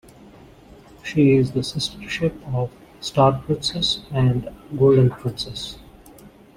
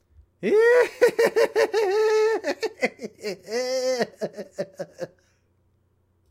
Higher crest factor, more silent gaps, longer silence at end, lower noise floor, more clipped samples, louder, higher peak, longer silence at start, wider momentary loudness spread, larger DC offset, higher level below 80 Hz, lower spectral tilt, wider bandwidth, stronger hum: about the same, 20 dB vs 18 dB; neither; second, 0.3 s vs 1.25 s; second, -46 dBFS vs -66 dBFS; neither; about the same, -21 LUFS vs -23 LUFS; first, -2 dBFS vs -6 dBFS; first, 1.05 s vs 0.4 s; about the same, 15 LU vs 16 LU; neither; first, -46 dBFS vs -68 dBFS; first, -6 dB/octave vs -3.5 dB/octave; about the same, 14.5 kHz vs 15.5 kHz; neither